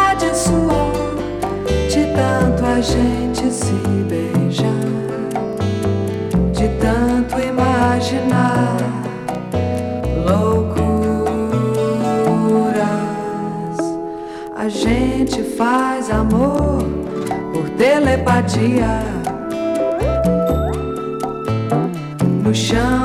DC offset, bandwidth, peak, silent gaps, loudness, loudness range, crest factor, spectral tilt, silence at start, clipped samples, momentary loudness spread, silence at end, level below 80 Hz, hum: under 0.1%; 15 kHz; -6 dBFS; none; -18 LUFS; 2 LU; 10 dB; -6 dB/octave; 0 s; under 0.1%; 7 LU; 0 s; -30 dBFS; none